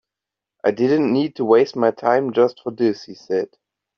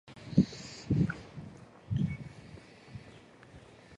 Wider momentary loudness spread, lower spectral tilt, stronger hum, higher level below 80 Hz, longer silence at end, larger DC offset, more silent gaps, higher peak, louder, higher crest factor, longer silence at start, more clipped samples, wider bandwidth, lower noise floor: second, 8 LU vs 24 LU; second, -5 dB/octave vs -7.5 dB/octave; neither; second, -66 dBFS vs -52 dBFS; first, 0.5 s vs 0 s; neither; neither; first, -2 dBFS vs -10 dBFS; first, -19 LUFS vs -33 LUFS; second, 16 dB vs 26 dB; first, 0.65 s vs 0.05 s; neither; second, 6.6 kHz vs 10 kHz; first, -86 dBFS vs -55 dBFS